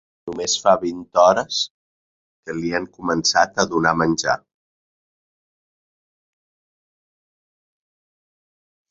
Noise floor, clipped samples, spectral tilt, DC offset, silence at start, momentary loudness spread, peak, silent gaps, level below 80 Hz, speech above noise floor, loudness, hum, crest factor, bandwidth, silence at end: under -90 dBFS; under 0.1%; -3 dB/octave; under 0.1%; 0.25 s; 11 LU; -2 dBFS; 1.71-2.43 s; -56 dBFS; over 71 dB; -19 LUFS; none; 22 dB; 7.8 kHz; 4.55 s